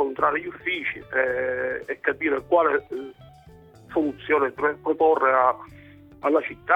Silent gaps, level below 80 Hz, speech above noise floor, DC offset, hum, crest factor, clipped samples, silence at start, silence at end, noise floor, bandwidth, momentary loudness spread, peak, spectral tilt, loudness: none; -58 dBFS; 26 dB; under 0.1%; none; 18 dB; under 0.1%; 0 s; 0 s; -49 dBFS; 5.2 kHz; 9 LU; -6 dBFS; -6.5 dB/octave; -23 LUFS